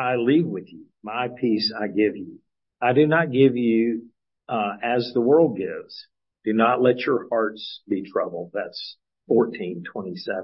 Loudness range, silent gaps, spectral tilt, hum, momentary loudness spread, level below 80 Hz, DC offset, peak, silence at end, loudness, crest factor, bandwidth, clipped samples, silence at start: 3 LU; none; -10.5 dB/octave; none; 16 LU; -72 dBFS; under 0.1%; -4 dBFS; 0 s; -23 LUFS; 18 dB; 5.8 kHz; under 0.1%; 0 s